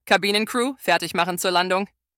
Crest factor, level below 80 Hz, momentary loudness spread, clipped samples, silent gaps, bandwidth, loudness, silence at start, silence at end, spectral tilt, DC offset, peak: 20 dB; -66 dBFS; 5 LU; under 0.1%; none; 18 kHz; -21 LUFS; 0.05 s; 0.3 s; -3 dB/octave; under 0.1%; -2 dBFS